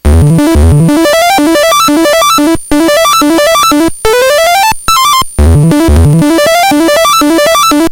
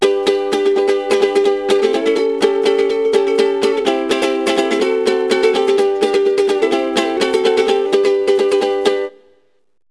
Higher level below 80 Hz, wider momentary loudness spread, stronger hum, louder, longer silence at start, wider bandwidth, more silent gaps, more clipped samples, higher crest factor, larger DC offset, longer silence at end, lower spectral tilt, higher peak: first, -16 dBFS vs -56 dBFS; about the same, 2 LU vs 2 LU; neither; first, -6 LUFS vs -15 LUFS; about the same, 0.05 s vs 0 s; first, over 20 kHz vs 11 kHz; neither; first, 3% vs under 0.1%; second, 6 dB vs 14 dB; second, under 0.1% vs 0.2%; second, 0 s vs 0.8 s; first, -4.5 dB/octave vs -3 dB/octave; about the same, 0 dBFS vs 0 dBFS